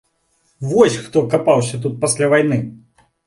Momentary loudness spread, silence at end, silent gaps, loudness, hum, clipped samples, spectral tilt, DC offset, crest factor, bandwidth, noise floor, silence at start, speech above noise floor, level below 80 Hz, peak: 8 LU; 0.5 s; none; -16 LUFS; none; under 0.1%; -5 dB/octave; under 0.1%; 18 dB; 11.5 kHz; -63 dBFS; 0.6 s; 47 dB; -56 dBFS; 0 dBFS